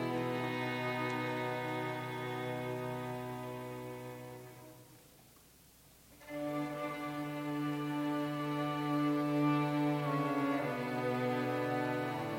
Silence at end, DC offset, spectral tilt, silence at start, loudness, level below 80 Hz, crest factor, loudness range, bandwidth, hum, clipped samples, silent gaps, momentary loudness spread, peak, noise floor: 0 s; under 0.1%; -6.5 dB/octave; 0 s; -36 LUFS; -72 dBFS; 14 dB; 12 LU; 17 kHz; none; under 0.1%; none; 13 LU; -22 dBFS; -62 dBFS